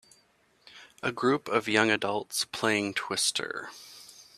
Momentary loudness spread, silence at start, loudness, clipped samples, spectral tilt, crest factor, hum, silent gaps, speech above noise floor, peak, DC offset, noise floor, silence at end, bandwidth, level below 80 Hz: 18 LU; 0.75 s; -28 LUFS; under 0.1%; -2.5 dB/octave; 24 dB; none; none; 37 dB; -6 dBFS; under 0.1%; -66 dBFS; 0.15 s; 15.5 kHz; -72 dBFS